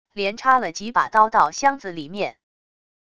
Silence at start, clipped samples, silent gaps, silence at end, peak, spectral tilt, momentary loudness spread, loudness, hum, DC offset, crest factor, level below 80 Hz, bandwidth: 0.15 s; under 0.1%; none; 0.8 s; -2 dBFS; -3 dB/octave; 12 LU; -20 LUFS; none; 0.5%; 20 dB; -60 dBFS; 10 kHz